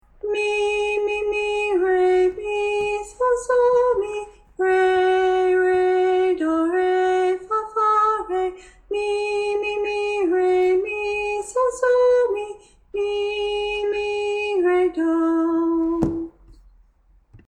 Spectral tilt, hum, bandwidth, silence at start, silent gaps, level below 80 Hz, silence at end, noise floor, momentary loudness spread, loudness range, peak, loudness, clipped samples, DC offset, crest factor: -4.5 dB/octave; none; 10 kHz; 0.25 s; none; -50 dBFS; 0.1 s; -57 dBFS; 7 LU; 3 LU; -6 dBFS; -21 LUFS; under 0.1%; under 0.1%; 14 dB